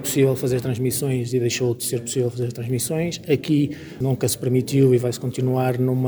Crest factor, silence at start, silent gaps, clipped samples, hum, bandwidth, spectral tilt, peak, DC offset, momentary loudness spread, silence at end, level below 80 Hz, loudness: 16 dB; 0 s; none; under 0.1%; none; over 20 kHz; -6 dB/octave; -6 dBFS; under 0.1%; 7 LU; 0 s; -56 dBFS; -22 LUFS